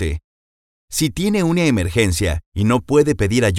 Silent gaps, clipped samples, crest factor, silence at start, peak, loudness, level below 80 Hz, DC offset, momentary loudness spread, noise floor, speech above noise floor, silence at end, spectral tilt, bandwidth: 0.24-0.88 s, 2.46-2.52 s; under 0.1%; 16 dB; 0 s; 0 dBFS; -18 LUFS; -32 dBFS; under 0.1%; 7 LU; under -90 dBFS; over 73 dB; 0 s; -5.5 dB/octave; 16.5 kHz